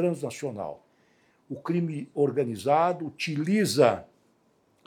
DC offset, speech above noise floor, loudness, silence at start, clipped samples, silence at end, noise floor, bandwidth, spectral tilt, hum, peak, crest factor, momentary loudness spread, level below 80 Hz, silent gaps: under 0.1%; 40 dB; -27 LUFS; 0 s; under 0.1%; 0.8 s; -66 dBFS; 18.5 kHz; -5.5 dB/octave; none; -6 dBFS; 22 dB; 14 LU; -76 dBFS; none